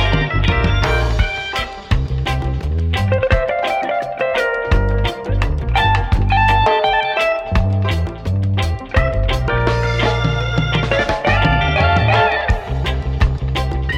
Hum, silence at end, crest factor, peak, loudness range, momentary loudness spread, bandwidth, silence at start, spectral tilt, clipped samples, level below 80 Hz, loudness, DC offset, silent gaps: none; 0 s; 14 dB; -2 dBFS; 2 LU; 6 LU; 11.5 kHz; 0 s; -6.5 dB/octave; under 0.1%; -22 dBFS; -17 LUFS; under 0.1%; none